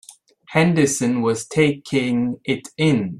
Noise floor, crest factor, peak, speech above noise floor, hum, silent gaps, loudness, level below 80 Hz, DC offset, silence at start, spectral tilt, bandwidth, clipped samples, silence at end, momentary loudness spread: -46 dBFS; 16 dB; -4 dBFS; 27 dB; none; none; -20 LUFS; -56 dBFS; under 0.1%; 0.5 s; -5.5 dB/octave; 13.5 kHz; under 0.1%; 0 s; 6 LU